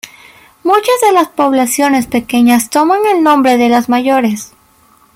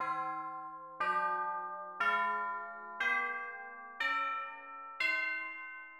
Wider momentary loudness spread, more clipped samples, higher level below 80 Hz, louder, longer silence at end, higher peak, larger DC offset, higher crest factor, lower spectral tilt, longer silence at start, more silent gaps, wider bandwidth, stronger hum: second, 7 LU vs 13 LU; neither; first, -52 dBFS vs -80 dBFS; first, -11 LUFS vs -35 LUFS; first, 0.7 s vs 0 s; first, 0 dBFS vs -20 dBFS; neither; second, 10 dB vs 16 dB; about the same, -3.5 dB/octave vs -2.5 dB/octave; about the same, 0.05 s vs 0 s; neither; about the same, 16.5 kHz vs 15.5 kHz; neither